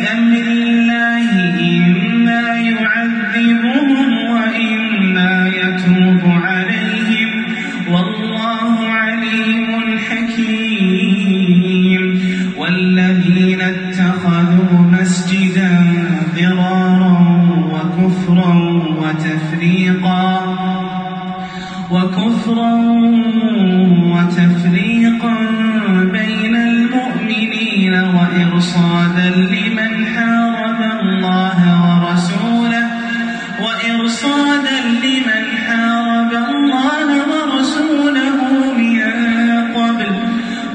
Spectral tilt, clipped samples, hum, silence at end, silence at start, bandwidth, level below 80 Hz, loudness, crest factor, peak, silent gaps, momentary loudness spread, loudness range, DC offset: -6.5 dB/octave; under 0.1%; none; 0 s; 0 s; 9.2 kHz; -54 dBFS; -13 LUFS; 12 dB; 0 dBFS; none; 5 LU; 3 LU; under 0.1%